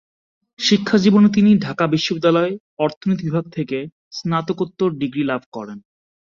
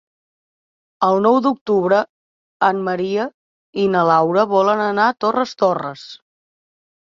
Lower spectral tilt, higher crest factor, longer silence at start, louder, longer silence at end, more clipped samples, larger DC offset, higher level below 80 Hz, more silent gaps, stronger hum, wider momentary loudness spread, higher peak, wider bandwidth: about the same, -6 dB/octave vs -6.5 dB/octave; about the same, 16 dB vs 18 dB; second, 0.6 s vs 1 s; about the same, -18 LUFS vs -17 LUFS; second, 0.6 s vs 0.95 s; neither; neither; first, -58 dBFS vs -64 dBFS; second, 2.60-2.77 s, 2.97-3.01 s, 3.92-4.11 s, 5.46-5.52 s vs 1.61-1.66 s, 2.09-2.60 s, 3.34-3.73 s; neither; about the same, 14 LU vs 14 LU; about the same, -2 dBFS vs -2 dBFS; about the same, 7.4 kHz vs 7.4 kHz